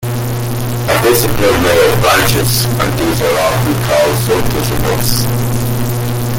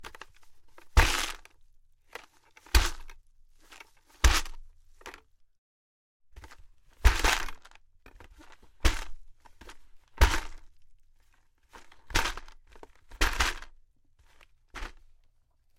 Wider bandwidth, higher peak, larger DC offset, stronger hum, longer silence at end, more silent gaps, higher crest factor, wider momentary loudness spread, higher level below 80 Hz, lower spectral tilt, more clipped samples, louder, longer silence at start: about the same, 17 kHz vs 16.5 kHz; first, 0 dBFS vs -6 dBFS; neither; neither; second, 0 s vs 0.85 s; second, none vs 5.58-6.20 s; second, 12 dB vs 26 dB; second, 7 LU vs 26 LU; first, -28 dBFS vs -34 dBFS; first, -4.5 dB/octave vs -3 dB/octave; neither; first, -12 LUFS vs -29 LUFS; about the same, 0 s vs 0 s